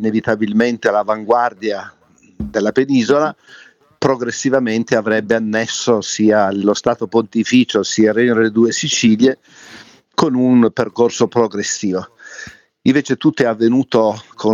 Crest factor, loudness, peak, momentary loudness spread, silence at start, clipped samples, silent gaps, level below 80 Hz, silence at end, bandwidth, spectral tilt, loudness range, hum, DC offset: 14 dB; -15 LUFS; -2 dBFS; 8 LU; 0 s; under 0.1%; none; -52 dBFS; 0 s; 8 kHz; -4.5 dB/octave; 3 LU; none; under 0.1%